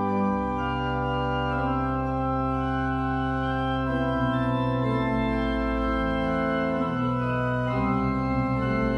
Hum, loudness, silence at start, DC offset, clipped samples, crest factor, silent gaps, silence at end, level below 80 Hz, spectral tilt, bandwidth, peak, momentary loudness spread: none; -26 LUFS; 0 s; under 0.1%; under 0.1%; 12 dB; none; 0 s; -36 dBFS; -8.5 dB/octave; 6.6 kHz; -12 dBFS; 2 LU